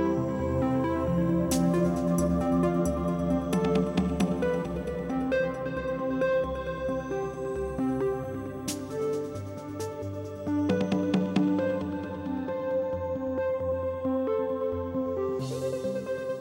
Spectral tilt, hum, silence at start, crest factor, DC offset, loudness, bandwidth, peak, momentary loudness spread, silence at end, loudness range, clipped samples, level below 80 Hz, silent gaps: -7 dB/octave; none; 0 s; 18 dB; under 0.1%; -29 LUFS; 16 kHz; -10 dBFS; 8 LU; 0 s; 5 LU; under 0.1%; -46 dBFS; none